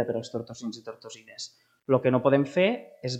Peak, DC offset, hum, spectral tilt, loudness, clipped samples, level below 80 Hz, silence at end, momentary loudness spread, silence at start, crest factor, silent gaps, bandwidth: -8 dBFS; under 0.1%; none; -6 dB/octave; -26 LUFS; under 0.1%; -72 dBFS; 0 s; 20 LU; 0 s; 20 dB; none; 9 kHz